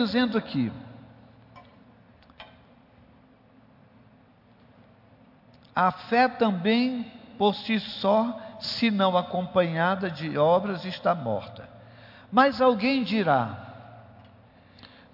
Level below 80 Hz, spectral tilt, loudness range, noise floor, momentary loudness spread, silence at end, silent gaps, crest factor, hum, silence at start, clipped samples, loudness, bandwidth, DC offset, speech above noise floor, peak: -66 dBFS; -7.5 dB/octave; 7 LU; -57 dBFS; 13 LU; 0.25 s; none; 18 dB; none; 0 s; under 0.1%; -25 LUFS; 5.8 kHz; under 0.1%; 33 dB; -10 dBFS